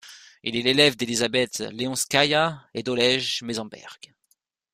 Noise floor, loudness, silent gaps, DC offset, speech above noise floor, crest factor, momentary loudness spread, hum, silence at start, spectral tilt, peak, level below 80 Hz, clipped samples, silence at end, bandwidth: -70 dBFS; -23 LUFS; none; under 0.1%; 46 dB; 22 dB; 14 LU; none; 0.05 s; -3 dB/octave; -4 dBFS; -62 dBFS; under 0.1%; 0.8 s; 15.5 kHz